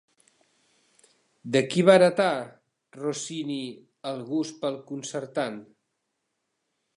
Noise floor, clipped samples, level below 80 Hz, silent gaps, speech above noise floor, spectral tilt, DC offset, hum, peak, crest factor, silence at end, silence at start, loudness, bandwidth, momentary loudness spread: -79 dBFS; under 0.1%; -76 dBFS; none; 54 dB; -5 dB/octave; under 0.1%; none; -4 dBFS; 24 dB; 1.35 s; 1.45 s; -26 LUFS; 11.5 kHz; 19 LU